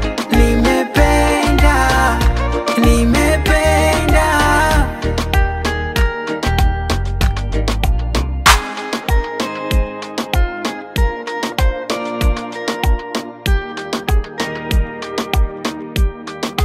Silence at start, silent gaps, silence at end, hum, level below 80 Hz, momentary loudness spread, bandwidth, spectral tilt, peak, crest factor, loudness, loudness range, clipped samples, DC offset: 0 s; none; 0 s; none; -18 dBFS; 9 LU; 16 kHz; -5 dB/octave; 0 dBFS; 16 dB; -16 LUFS; 7 LU; under 0.1%; under 0.1%